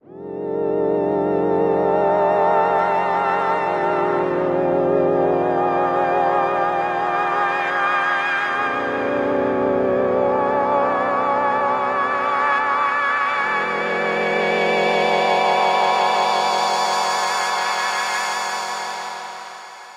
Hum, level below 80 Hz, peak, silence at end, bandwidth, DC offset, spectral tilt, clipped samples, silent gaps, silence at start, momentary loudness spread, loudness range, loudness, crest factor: none; -58 dBFS; -4 dBFS; 0 s; 15 kHz; under 0.1%; -4 dB/octave; under 0.1%; none; 0.1 s; 5 LU; 2 LU; -19 LUFS; 14 dB